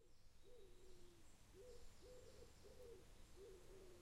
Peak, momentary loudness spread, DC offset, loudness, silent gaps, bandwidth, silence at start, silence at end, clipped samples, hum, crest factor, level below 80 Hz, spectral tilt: -48 dBFS; 5 LU; under 0.1%; -66 LUFS; none; 15 kHz; 0 s; 0 s; under 0.1%; none; 12 dB; -68 dBFS; -4.5 dB/octave